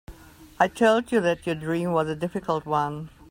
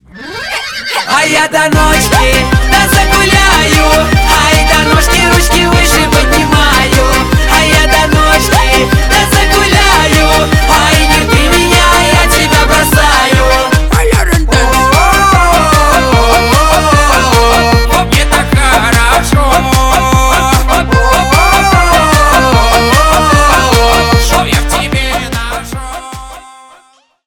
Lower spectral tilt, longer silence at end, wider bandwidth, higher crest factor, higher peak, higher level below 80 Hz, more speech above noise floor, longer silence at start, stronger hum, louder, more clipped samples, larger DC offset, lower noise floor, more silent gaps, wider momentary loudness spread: first, -6 dB/octave vs -3.5 dB/octave; second, 0.25 s vs 0.85 s; second, 16 kHz vs 20 kHz; first, 18 dB vs 8 dB; second, -6 dBFS vs 0 dBFS; second, -54 dBFS vs -14 dBFS; second, 24 dB vs 39 dB; about the same, 0.1 s vs 0.15 s; neither; second, -25 LUFS vs -7 LUFS; second, under 0.1% vs 0.8%; neither; about the same, -48 dBFS vs -46 dBFS; neither; first, 8 LU vs 4 LU